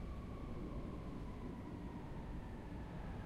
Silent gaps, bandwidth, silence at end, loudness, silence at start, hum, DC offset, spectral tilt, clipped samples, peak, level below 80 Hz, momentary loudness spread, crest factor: none; 13 kHz; 0 s; -49 LUFS; 0 s; none; under 0.1%; -8 dB/octave; under 0.1%; -36 dBFS; -52 dBFS; 2 LU; 12 dB